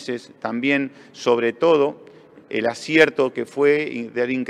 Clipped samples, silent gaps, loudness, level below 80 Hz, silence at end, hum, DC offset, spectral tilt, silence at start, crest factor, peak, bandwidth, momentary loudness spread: under 0.1%; none; -20 LUFS; -70 dBFS; 0 s; none; under 0.1%; -5 dB/octave; 0 s; 20 dB; -2 dBFS; 11 kHz; 12 LU